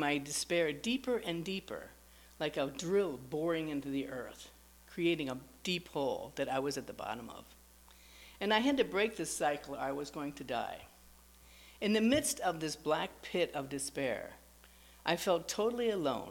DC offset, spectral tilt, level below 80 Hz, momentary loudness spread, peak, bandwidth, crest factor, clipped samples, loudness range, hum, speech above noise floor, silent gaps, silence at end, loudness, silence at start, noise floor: under 0.1%; -3.5 dB/octave; -64 dBFS; 14 LU; -14 dBFS; 19 kHz; 22 dB; under 0.1%; 3 LU; none; 25 dB; none; 0 s; -35 LUFS; 0 s; -60 dBFS